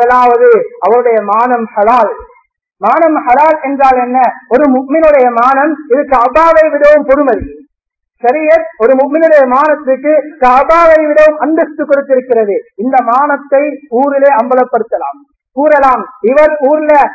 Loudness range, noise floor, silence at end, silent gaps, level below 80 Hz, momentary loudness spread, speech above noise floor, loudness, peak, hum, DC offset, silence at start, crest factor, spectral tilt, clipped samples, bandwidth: 3 LU; -71 dBFS; 0 s; none; -42 dBFS; 7 LU; 63 dB; -8 LUFS; 0 dBFS; none; under 0.1%; 0 s; 8 dB; -6.5 dB/octave; 1%; 8 kHz